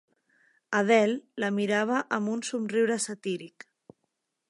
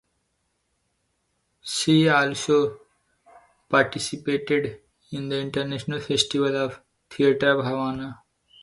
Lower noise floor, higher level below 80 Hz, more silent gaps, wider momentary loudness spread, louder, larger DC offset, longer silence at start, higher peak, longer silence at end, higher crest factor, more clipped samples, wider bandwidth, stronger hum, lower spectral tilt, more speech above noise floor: first, -80 dBFS vs -73 dBFS; second, -82 dBFS vs -60 dBFS; neither; second, 11 LU vs 14 LU; second, -27 LUFS vs -23 LUFS; neither; second, 0.7 s vs 1.65 s; second, -10 dBFS vs -4 dBFS; first, 1 s vs 0.5 s; about the same, 20 dB vs 20 dB; neither; about the same, 11.5 kHz vs 11.5 kHz; neither; about the same, -4.5 dB/octave vs -4.5 dB/octave; about the same, 53 dB vs 50 dB